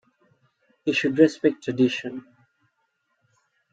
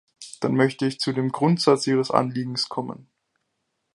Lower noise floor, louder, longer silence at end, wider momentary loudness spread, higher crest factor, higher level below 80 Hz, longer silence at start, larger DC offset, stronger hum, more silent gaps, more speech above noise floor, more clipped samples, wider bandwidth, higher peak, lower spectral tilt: about the same, -73 dBFS vs -76 dBFS; about the same, -23 LUFS vs -23 LUFS; first, 1.55 s vs 0.95 s; about the same, 14 LU vs 13 LU; about the same, 22 dB vs 22 dB; about the same, -72 dBFS vs -70 dBFS; first, 0.85 s vs 0.2 s; neither; neither; neither; about the same, 51 dB vs 54 dB; neither; second, 7.8 kHz vs 11.5 kHz; about the same, -4 dBFS vs -2 dBFS; about the same, -6 dB/octave vs -5.5 dB/octave